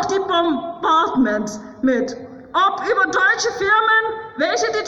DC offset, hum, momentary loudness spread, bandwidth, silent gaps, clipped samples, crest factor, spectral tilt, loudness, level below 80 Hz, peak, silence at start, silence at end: under 0.1%; none; 9 LU; 11.5 kHz; none; under 0.1%; 12 dB; -3 dB/octave; -18 LUFS; -54 dBFS; -6 dBFS; 0 s; 0 s